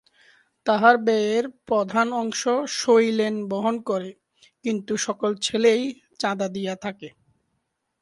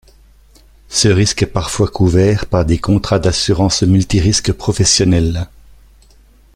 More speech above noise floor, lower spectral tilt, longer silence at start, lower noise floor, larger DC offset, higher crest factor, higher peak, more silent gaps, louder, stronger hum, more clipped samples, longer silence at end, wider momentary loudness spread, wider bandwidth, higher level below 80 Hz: first, 53 dB vs 33 dB; about the same, -4 dB/octave vs -5 dB/octave; second, 0.65 s vs 0.9 s; first, -76 dBFS vs -46 dBFS; neither; first, 22 dB vs 14 dB; about the same, -2 dBFS vs 0 dBFS; neither; second, -23 LUFS vs -14 LUFS; neither; neither; second, 0.95 s vs 1.1 s; first, 13 LU vs 6 LU; second, 11.5 kHz vs 13 kHz; second, -70 dBFS vs -30 dBFS